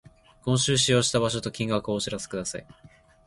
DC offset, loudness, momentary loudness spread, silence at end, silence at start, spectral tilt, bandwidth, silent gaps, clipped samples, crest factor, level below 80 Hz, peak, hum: under 0.1%; -25 LUFS; 13 LU; 0.4 s; 0.45 s; -4 dB/octave; 11.5 kHz; none; under 0.1%; 20 dB; -54 dBFS; -8 dBFS; none